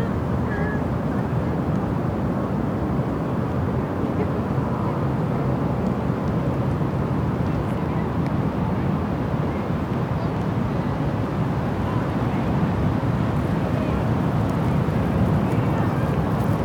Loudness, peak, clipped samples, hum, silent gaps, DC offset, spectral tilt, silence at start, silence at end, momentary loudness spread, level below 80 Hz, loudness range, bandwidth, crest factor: -23 LUFS; -8 dBFS; under 0.1%; none; none; under 0.1%; -9 dB/octave; 0 s; 0 s; 2 LU; -36 dBFS; 2 LU; 18 kHz; 14 dB